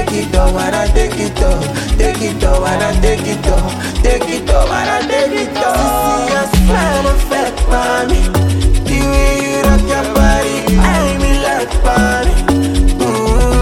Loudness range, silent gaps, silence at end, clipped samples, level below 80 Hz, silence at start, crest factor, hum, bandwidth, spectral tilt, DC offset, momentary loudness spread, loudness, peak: 2 LU; none; 0 s; under 0.1%; -14 dBFS; 0 s; 12 dB; none; 16 kHz; -5 dB/octave; under 0.1%; 3 LU; -13 LUFS; 0 dBFS